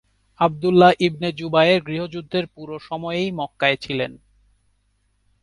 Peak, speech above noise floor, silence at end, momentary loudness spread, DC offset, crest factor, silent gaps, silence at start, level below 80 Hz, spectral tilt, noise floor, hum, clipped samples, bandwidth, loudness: -2 dBFS; 46 dB; 1.25 s; 15 LU; under 0.1%; 20 dB; none; 0.4 s; -56 dBFS; -6.5 dB/octave; -66 dBFS; 50 Hz at -55 dBFS; under 0.1%; 11 kHz; -20 LUFS